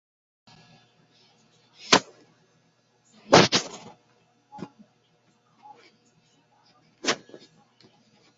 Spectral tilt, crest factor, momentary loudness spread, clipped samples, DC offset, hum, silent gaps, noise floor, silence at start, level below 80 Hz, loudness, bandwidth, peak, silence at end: -2 dB/octave; 28 dB; 27 LU; under 0.1%; under 0.1%; none; none; -66 dBFS; 1.9 s; -64 dBFS; -22 LUFS; 7.6 kHz; -2 dBFS; 1.2 s